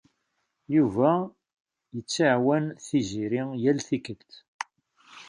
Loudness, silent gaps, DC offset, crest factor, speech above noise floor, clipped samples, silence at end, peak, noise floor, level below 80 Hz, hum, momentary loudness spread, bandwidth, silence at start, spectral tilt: -26 LUFS; 1.60-1.65 s, 4.48-4.59 s; under 0.1%; 18 dB; 52 dB; under 0.1%; 0.05 s; -8 dBFS; -77 dBFS; -64 dBFS; none; 17 LU; 10.5 kHz; 0.7 s; -5.5 dB/octave